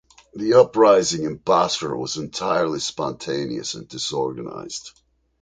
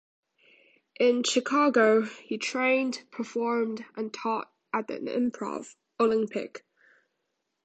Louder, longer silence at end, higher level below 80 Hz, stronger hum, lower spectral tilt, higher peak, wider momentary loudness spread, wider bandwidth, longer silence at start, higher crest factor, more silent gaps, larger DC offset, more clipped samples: first, -21 LUFS vs -27 LUFS; second, 0.5 s vs 1.05 s; first, -58 dBFS vs -78 dBFS; neither; about the same, -4 dB/octave vs -3.5 dB/octave; first, -2 dBFS vs -10 dBFS; first, 16 LU vs 13 LU; about the same, 9.4 kHz vs 9 kHz; second, 0.35 s vs 1 s; about the same, 18 dB vs 20 dB; neither; neither; neither